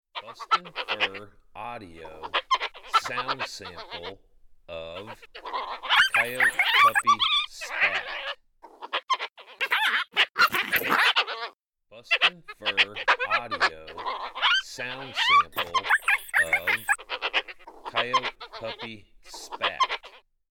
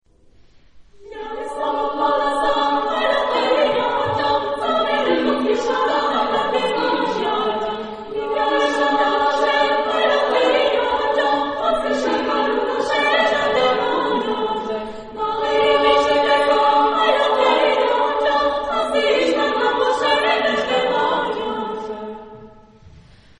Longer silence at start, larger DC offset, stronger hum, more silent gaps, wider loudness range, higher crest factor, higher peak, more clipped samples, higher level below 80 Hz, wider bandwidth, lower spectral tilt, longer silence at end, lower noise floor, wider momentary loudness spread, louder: second, 0.15 s vs 0.75 s; neither; neither; neither; first, 8 LU vs 4 LU; about the same, 18 dB vs 16 dB; second, -10 dBFS vs -2 dBFS; neither; second, -60 dBFS vs -50 dBFS; first, 17.5 kHz vs 10.5 kHz; second, -1 dB/octave vs -3.5 dB/octave; about the same, 0.35 s vs 0.4 s; about the same, -53 dBFS vs -50 dBFS; first, 19 LU vs 9 LU; second, -24 LUFS vs -18 LUFS